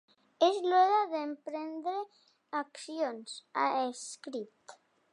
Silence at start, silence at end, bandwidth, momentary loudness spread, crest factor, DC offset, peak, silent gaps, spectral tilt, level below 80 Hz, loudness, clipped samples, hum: 0.4 s; 0.4 s; 11 kHz; 16 LU; 20 dB; under 0.1%; -12 dBFS; none; -2 dB/octave; under -90 dBFS; -32 LUFS; under 0.1%; none